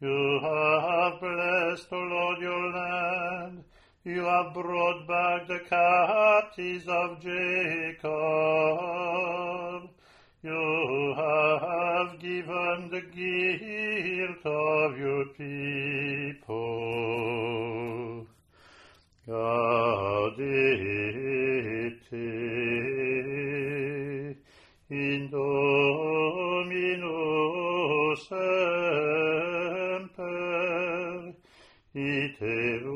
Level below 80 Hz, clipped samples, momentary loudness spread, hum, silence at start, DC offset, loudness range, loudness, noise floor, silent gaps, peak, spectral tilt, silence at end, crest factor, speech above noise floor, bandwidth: -66 dBFS; under 0.1%; 10 LU; none; 0 s; under 0.1%; 5 LU; -28 LUFS; -59 dBFS; none; -10 dBFS; -6.5 dB/octave; 0 s; 18 dB; 31 dB; 10.5 kHz